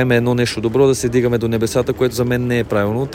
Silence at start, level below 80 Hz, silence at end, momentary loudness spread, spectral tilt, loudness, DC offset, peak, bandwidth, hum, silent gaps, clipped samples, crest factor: 0 s; -42 dBFS; 0 s; 4 LU; -6 dB/octave; -17 LUFS; under 0.1%; -2 dBFS; 16.5 kHz; none; none; under 0.1%; 14 dB